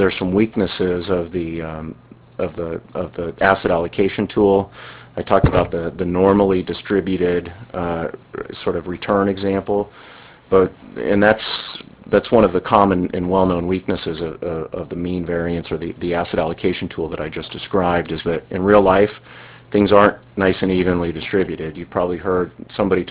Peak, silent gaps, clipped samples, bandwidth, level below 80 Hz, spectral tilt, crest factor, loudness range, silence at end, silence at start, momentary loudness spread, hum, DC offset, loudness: 0 dBFS; none; under 0.1%; 4 kHz; -38 dBFS; -10.5 dB/octave; 18 dB; 6 LU; 0 s; 0 s; 12 LU; none; under 0.1%; -19 LUFS